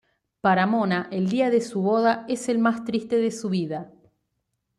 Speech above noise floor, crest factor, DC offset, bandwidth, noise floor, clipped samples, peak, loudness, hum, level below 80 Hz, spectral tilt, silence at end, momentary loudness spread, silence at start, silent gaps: 54 dB; 16 dB; under 0.1%; 12 kHz; -77 dBFS; under 0.1%; -8 dBFS; -23 LUFS; none; -68 dBFS; -6 dB/octave; 0.9 s; 6 LU; 0.45 s; none